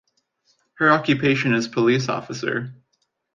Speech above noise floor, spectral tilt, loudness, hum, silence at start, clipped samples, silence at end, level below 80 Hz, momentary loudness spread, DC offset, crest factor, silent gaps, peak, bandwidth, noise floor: 51 dB; -5.5 dB/octave; -20 LUFS; none; 0.8 s; under 0.1%; 0.6 s; -62 dBFS; 9 LU; under 0.1%; 18 dB; none; -4 dBFS; 7.4 kHz; -72 dBFS